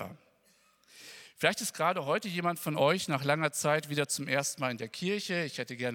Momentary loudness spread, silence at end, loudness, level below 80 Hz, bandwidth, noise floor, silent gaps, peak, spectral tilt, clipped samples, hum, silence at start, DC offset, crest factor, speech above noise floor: 9 LU; 0 s; -31 LUFS; -80 dBFS; 18.5 kHz; -67 dBFS; none; -10 dBFS; -3.5 dB/octave; under 0.1%; none; 0 s; under 0.1%; 22 dB; 36 dB